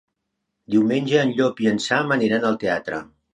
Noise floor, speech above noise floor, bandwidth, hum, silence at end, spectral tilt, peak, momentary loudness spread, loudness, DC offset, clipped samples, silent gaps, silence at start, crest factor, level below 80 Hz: -78 dBFS; 58 dB; 10 kHz; none; 0.3 s; -5.5 dB/octave; -4 dBFS; 6 LU; -21 LUFS; under 0.1%; under 0.1%; none; 0.7 s; 18 dB; -62 dBFS